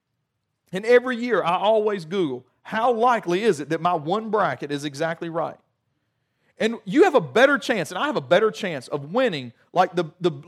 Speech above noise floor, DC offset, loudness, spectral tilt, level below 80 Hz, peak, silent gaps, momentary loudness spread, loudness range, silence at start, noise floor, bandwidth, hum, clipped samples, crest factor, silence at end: 55 dB; under 0.1%; -22 LUFS; -5.5 dB/octave; -76 dBFS; -4 dBFS; none; 11 LU; 4 LU; 0.7 s; -77 dBFS; 13.5 kHz; none; under 0.1%; 18 dB; 0.05 s